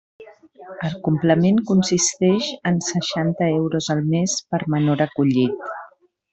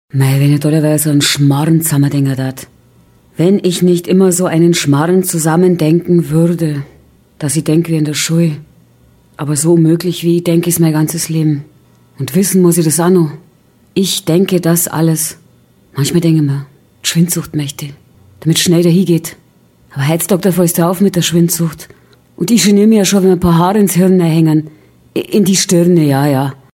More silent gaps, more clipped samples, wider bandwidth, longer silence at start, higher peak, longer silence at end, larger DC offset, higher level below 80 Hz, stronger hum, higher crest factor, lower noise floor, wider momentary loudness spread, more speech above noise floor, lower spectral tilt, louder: neither; neither; second, 8.4 kHz vs 17 kHz; about the same, 0.2 s vs 0.15 s; second, -4 dBFS vs 0 dBFS; first, 0.45 s vs 0.2 s; neither; second, -58 dBFS vs -46 dBFS; neither; about the same, 16 dB vs 12 dB; about the same, -49 dBFS vs -48 dBFS; about the same, 11 LU vs 10 LU; second, 29 dB vs 37 dB; about the same, -5 dB/octave vs -5.5 dB/octave; second, -20 LUFS vs -12 LUFS